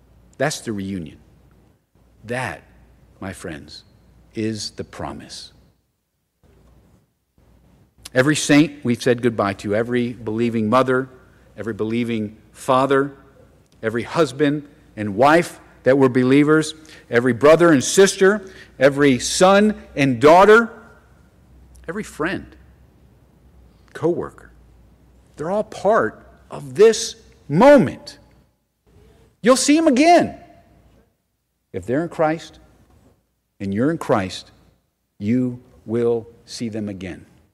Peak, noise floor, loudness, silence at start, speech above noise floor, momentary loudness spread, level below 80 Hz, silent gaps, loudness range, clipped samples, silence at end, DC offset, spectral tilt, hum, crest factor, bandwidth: -4 dBFS; -72 dBFS; -18 LUFS; 0.4 s; 54 dB; 20 LU; -52 dBFS; none; 16 LU; under 0.1%; 0.35 s; under 0.1%; -5 dB/octave; none; 16 dB; 15 kHz